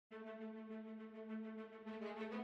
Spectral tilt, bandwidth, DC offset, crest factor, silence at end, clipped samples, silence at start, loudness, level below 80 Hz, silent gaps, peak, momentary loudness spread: -7.5 dB/octave; 6.4 kHz; under 0.1%; 14 dB; 0 s; under 0.1%; 0.1 s; -51 LUFS; -90 dBFS; none; -36 dBFS; 5 LU